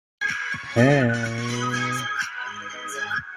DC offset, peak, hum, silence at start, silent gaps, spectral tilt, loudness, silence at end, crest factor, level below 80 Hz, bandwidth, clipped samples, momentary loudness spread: under 0.1%; -4 dBFS; none; 0.2 s; none; -5 dB/octave; -24 LUFS; 0 s; 22 dB; -58 dBFS; 15 kHz; under 0.1%; 13 LU